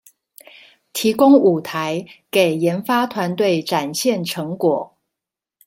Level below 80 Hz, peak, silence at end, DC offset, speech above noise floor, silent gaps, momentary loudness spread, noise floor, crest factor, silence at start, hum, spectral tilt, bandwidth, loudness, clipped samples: -66 dBFS; -2 dBFS; 0.8 s; under 0.1%; 68 dB; none; 12 LU; -85 dBFS; 18 dB; 0.95 s; none; -5 dB/octave; 16.5 kHz; -18 LUFS; under 0.1%